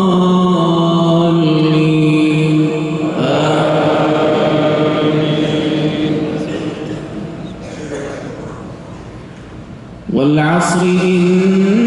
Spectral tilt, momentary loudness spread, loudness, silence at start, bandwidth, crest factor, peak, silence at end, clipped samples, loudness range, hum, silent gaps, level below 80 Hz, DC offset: -6.5 dB/octave; 18 LU; -13 LUFS; 0 s; 11.5 kHz; 12 dB; -2 dBFS; 0 s; under 0.1%; 12 LU; none; none; -46 dBFS; under 0.1%